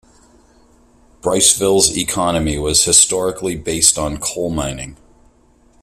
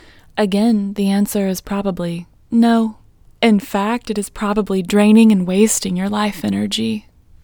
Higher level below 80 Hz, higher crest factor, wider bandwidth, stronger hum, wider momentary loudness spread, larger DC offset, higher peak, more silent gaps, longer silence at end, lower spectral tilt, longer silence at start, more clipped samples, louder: first, -38 dBFS vs -46 dBFS; about the same, 18 dB vs 16 dB; second, 16 kHz vs 20 kHz; first, 60 Hz at -45 dBFS vs none; about the same, 13 LU vs 11 LU; neither; about the same, 0 dBFS vs 0 dBFS; neither; first, 0.9 s vs 0.45 s; second, -2.5 dB/octave vs -5 dB/octave; first, 1.25 s vs 0.35 s; neither; first, -14 LUFS vs -17 LUFS